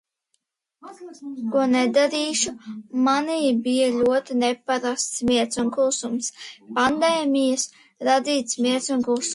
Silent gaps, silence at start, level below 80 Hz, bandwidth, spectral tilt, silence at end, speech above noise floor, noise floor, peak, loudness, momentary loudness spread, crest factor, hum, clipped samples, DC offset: none; 0.85 s; -60 dBFS; 11.5 kHz; -2.5 dB/octave; 0 s; 52 dB; -74 dBFS; -6 dBFS; -22 LUFS; 11 LU; 16 dB; none; under 0.1%; under 0.1%